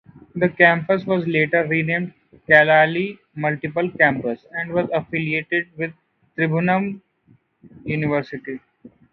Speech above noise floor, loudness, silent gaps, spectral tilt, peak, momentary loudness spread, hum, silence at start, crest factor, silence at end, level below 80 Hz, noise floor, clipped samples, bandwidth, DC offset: 38 dB; -19 LUFS; none; -9 dB/octave; 0 dBFS; 17 LU; none; 0.35 s; 20 dB; 0.25 s; -60 dBFS; -58 dBFS; under 0.1%; 5.8 kHz; under 0.1%